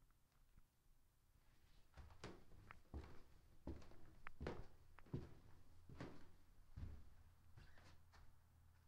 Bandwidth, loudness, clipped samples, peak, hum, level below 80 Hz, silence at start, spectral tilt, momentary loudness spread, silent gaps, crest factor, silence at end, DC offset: 15.5 kHz; -60 LUFS; under 0.1%; -34 dBFS; none; -66 dBFS; 0 s; -6.5 dB/octave; 13 LU; none; 24 dB; 0 s; under 0.1%